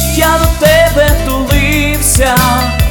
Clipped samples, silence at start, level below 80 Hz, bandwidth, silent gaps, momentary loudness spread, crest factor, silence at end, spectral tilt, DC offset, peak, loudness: 0.1%; 0 s; -16 dBFS; over 20 kHz; none; 4 LU; 10 dB; 0 s; -4 dB/octave; under 0.1%; 0 dBFS; -9 LUFS